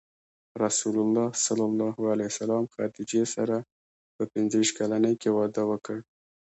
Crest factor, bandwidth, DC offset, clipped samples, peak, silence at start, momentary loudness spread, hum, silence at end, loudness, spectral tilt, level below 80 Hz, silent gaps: 16 dB; 8.2 kHz; under 0.1%; under 0.1%; -12 dBFS; 0.55 s; 8 LU; none; 0.5 s; -27 LUFS; -4.5 dB/octave; -72 dBFS; 3.72-4.19 s